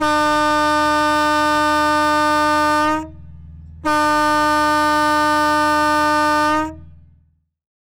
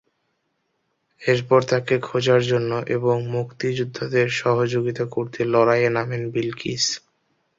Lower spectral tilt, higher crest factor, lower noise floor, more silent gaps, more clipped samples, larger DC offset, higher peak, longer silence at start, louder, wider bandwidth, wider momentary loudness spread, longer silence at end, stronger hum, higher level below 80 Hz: second, -3.5 dB/octave vs -5 dB/octave; second, 10 dB vs 20 dB; second, -58 dBFS vs -72 dBFS; neither; neither; neither; about the same, -6 dBFS vs -4 dBFS; second, 0 s vs 1.2 s; first, -16 LUFS vs -21 LUFS; first, over 20 kHz vs 7.8 kHz; second, 4 LU vs 8 LU; first, 0.9 s vs 0.6 s; first, 60 Hz at -55 dBFS vs none; first, -42 dBFS vs -60 dBFS